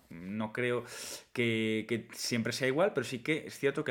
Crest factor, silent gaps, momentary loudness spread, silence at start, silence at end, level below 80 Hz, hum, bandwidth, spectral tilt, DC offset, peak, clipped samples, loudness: 18 dB; none; 9 LU; 0.1 s; 0 s; -74 dBFS; none; 18 kHz; -4.5 dB/octave; under 0.1%; -14 dBFS; under 0.1%; -33 LUFS